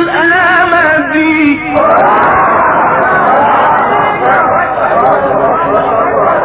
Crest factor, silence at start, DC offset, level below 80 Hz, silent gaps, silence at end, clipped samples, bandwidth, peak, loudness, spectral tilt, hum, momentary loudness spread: 8 dB; 0 s; under 0.1%; -38 dBFS; none; 0 s; 0.3%; 4 kHz; 0 dBFS; -8 LUFS; -9 dB/octave; none; 3 LU